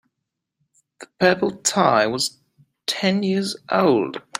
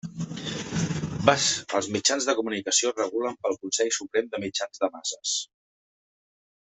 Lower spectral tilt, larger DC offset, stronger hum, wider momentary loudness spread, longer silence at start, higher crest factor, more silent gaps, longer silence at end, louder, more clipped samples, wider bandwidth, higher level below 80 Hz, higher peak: about the same, -4 dB/octave vs -3 dB/octave; neither; neither; about the same, 7 LU vs 8 LU; first, 1 s vs 0.05 s; second, 20 dB vs 26 dB; neither; second, 0 s vs 1.15 s; first, -20 LUFS vs -26 LUFS; neither; first, 15.5 kHz vs 8.4 kHz; second, -66 dBFS vs -60 dBFS; about the same, -2 dBFS vs -2 dBFS